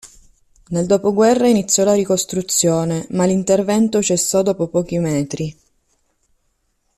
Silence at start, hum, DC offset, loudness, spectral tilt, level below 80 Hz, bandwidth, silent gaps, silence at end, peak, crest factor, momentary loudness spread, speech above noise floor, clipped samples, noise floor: 0.05 s; none; under 0.1%; -17 LUFS; -4.5 dB/octave; -52 dBFS; 14.5 kHz; none; 1.45 s; -2 dBFS; 14 dB; 7 LU; 50 dB; under 0.1%; -66 dBFS